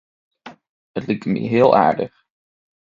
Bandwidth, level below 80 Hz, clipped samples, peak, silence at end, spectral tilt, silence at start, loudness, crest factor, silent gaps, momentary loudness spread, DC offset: 7.4 kHz; -60 dBFS; under 0.1%; 0 dBFS; 0.9 s; -8.5 dB/octave; 0.45 s; -17 LUFS; 20 dB; 0.69-0.94 s; 17 LU; under 0.1%